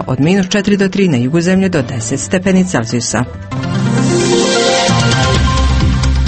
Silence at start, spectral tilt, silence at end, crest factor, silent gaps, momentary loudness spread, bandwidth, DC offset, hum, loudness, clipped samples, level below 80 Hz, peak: 0 s; -5 dB/octave; 0 s; 12 dB; none; 6 LU; 8.8 kHz; under 0.1%; none; -13 LUFS; under 0.1%; -22 dBFS; 0 dBFS